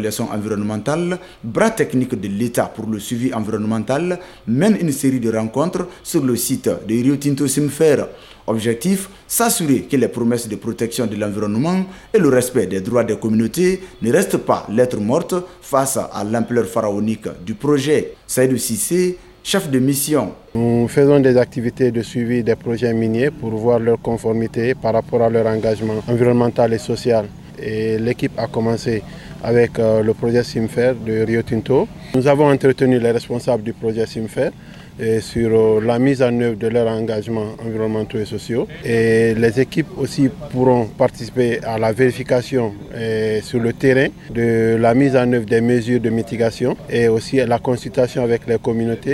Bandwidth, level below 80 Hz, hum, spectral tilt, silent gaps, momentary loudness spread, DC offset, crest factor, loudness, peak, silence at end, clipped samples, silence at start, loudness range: 17 kHz; -46 dBFS; none; -6 dB/octave; none; 8 LU; under 0.1%; 16 dB; -18 LUFS; 0 dBFS; 0 s; under 0.1%; 0 s; 3 LU